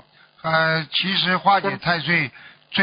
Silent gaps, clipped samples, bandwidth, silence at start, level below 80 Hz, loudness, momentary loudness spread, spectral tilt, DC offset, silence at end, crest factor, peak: none; under 0.1%; 5.2 kHz; 0.45 s; -60 dBFS; -20 LUFS; 7 LU; -9.5 dB/octave; under 0.1%; 0 s; 18 dB; -4 dBFS